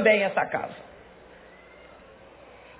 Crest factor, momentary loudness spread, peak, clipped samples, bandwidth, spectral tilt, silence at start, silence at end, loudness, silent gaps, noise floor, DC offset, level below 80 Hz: 20 dB; 27 LU; -8 dBFS; under 0.1%; 4 kHz; -8 dB/octave; 0 s; 1.95 s; -25 LUFS; none; -50 dBFS; under 0.1%; -62 dBFS